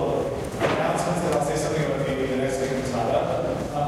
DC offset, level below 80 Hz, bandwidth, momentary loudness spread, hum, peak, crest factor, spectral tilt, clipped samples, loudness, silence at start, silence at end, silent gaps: under 0.1%; -44 dBFS; 15.5 kHz; 3 LU; none; -10 dBFS; 14 dB; -5.5 dB/octave; under 0.1%; -25 LUFS; 0 s; 0 s; none